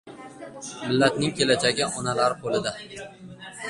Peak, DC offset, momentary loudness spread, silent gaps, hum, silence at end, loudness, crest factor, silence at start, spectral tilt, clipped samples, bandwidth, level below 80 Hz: -4 dBFS; under 0.1%; 20 LU; none; none; 0 s; -24 LUFS; 22 dB; 0.05 s; -4 dB/octave; under 0.1%; 11.5 kHz; -60 dBFS